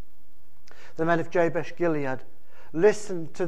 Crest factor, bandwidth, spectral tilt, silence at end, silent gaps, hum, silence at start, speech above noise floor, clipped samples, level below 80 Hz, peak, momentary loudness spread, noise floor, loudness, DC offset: 20 dB; 13 kHz; -6.5 dB/octave; 0 s; none; none; 0.85 s; 35 dB; under 0.1%; -62 dBFS; -8 dBFS; 13 LU; -61 dBFS; -26 LUFS; 4%